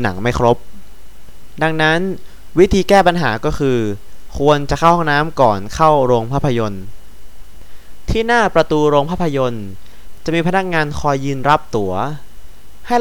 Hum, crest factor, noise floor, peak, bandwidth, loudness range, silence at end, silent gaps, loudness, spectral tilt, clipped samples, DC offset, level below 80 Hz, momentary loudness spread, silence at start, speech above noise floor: none; 16 dB; -37 dBFS; 0 dBFS; 20 kHz; 3 LU; 0 s; none; -15 LUFS; -6 dB/octave; under 0.1%; 6%; -34 dBFS; 12 LU; 0 s; 23 dB